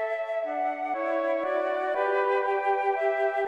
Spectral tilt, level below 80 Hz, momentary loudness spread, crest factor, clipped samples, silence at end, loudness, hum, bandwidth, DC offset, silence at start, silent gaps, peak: -3.5 dB/octave; -80 dBFS; 4 LU; 12 dB; under 0.1%; 0 s; -27 LUFS; none; 8.2 kHz; under 0.1%; 0 s; none; -14 dBFS